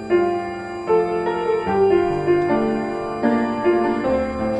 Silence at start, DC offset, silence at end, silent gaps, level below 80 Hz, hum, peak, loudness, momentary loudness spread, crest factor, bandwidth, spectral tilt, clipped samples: 0 s; under 0.1%; 0 s; none; -46 dBFS; none; -6 dBFS; -20 LUFS; 6 LU; 14 dB; 8.4 kHz; -7.5 dB/octave; under 0.1%